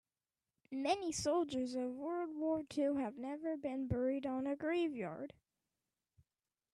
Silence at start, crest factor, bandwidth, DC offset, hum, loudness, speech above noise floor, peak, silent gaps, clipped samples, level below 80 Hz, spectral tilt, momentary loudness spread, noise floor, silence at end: 0.7 s; 18 dB; 13 kHz; under 0.1%; none; -39 LUFS; over 51 dB; -22 dBFS; none; under 0.1%; -66 dBFS; -5 dB/octave; 7 LU; under -90 dBFS; 1.45 s